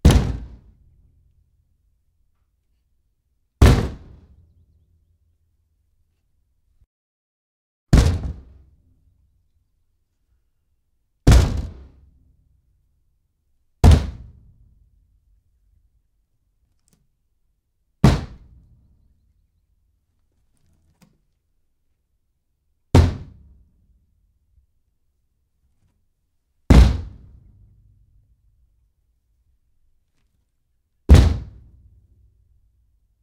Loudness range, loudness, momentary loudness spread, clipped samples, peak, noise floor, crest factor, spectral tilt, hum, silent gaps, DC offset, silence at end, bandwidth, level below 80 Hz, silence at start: 4 LU; -18 LUFS; 25 LU; under 0.1%; 0 dBFS; -70 dBFS; 24 dB; -6.5 dB/octave; none; 6.86-7.87 s; under 0.1%; 1.8 s; 14 kHz; -26 dBFS; 0.05 s